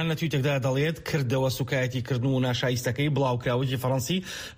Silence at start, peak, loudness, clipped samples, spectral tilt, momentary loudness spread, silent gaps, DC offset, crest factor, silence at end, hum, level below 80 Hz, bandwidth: 0 s; -14 dBFS; -27 LUFS; under 0.1%; -5.5 dB/octave; 3 LU; none; under 0.1%; 12 dB; 0.05 s; none; -54 dBFS; 15.5 kHz